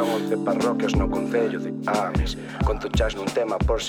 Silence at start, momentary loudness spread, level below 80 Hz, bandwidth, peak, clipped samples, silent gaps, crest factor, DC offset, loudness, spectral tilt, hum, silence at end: 0 s; 4 LU; -32 dBFS; 17.5 kHz; -8 dBFS; under 0.1%; none; 14 dB; under 0.1%; -24 LUFS; -6 dB/octave; none; 0 s